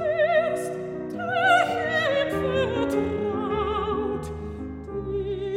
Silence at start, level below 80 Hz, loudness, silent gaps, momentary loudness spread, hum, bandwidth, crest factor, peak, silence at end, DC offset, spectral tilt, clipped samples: 0 s; -44 dBFS; -25 LUFS; none; 13 LU; none; 16 kHz; 18 dB; -8 dBFS; 0 s; under 0.1%; -5.5 dB/octave; under 0.1%